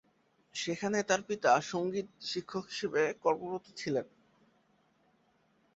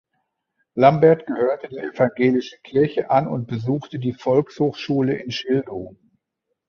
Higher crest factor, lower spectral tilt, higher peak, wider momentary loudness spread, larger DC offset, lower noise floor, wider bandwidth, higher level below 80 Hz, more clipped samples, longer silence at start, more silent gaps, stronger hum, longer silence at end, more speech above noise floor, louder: about the same, 20 dB vs 20 dB; second, -3 dB/octave vs -7.5 dB/octave; second, -14 dBFS vs -2 dBFS; about the same, 11 LU vs 11 LU; neither; second, -71 dBFS vs -78 dBFS; first, 8 kHz vs 6.8 kHz; second, -76 dBFS vs -60 dBFS; neither; second, 0.55 s vs 0.75 s; neither; neither; first, 1.7 s vs 0.8 s; second, 38 dB vs 58 dB; second, -33 LUFS vs -20 LUFS